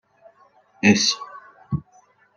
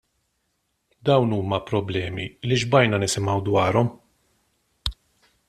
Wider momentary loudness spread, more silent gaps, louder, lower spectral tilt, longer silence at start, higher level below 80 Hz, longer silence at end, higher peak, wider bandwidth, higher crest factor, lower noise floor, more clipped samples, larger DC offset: about the same, 14 LU vs 12 LU; neither; about the same, -21 LUFS vs -23 LUFS; second, -3.5 dB/octave vs -5.5 dB/octave; second, 0.85 s vs 1.05 s; second, -56 dBFS vs -48 dBFS; about the same, 0.55 s vs 0.55 s; about the same, -2 dBFS vs -2 dBFS; second, 10 kHz vs 14 kHz; about the same, 22 dB vs 22 dB; second, -57 dBFS vs -73 dBFS; neither; neither